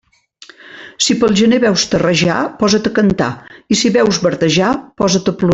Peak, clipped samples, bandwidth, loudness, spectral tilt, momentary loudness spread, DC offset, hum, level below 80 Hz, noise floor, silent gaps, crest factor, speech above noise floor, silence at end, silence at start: -2 dBFS; under 0.1%; 8.4 kHz; -13 LUFS; -4.5 dB/octave; 6 LU; under 0.1%; none; -44 dBFS; -43 dBFS; none; 12 dB; 30 dB; 0 s; 0.65 s